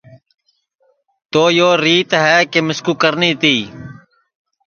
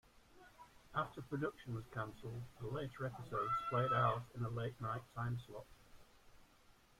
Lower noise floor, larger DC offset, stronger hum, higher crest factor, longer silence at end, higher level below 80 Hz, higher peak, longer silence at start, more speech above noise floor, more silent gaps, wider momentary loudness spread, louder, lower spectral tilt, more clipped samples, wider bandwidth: second, -61 dBFS vs -68 dBFS; neither; neither; about the same, 16 dB vs 20 dB; first, 0.75 s vs 0.3 s; first, -58 dBFS vs -66 dBFS; first, 0 dBFS vs -22 dBFS; first, 1.35 s vs 0.15 s; first, 48 dB vs 26 dB; neither; second, 7 LU vs 17 LU; first, -13 LUFS vs -42 LUFS; second, -4 dB/octave vs -7 dB/octave; neither; second, 7 kHz vs 14.5 kHz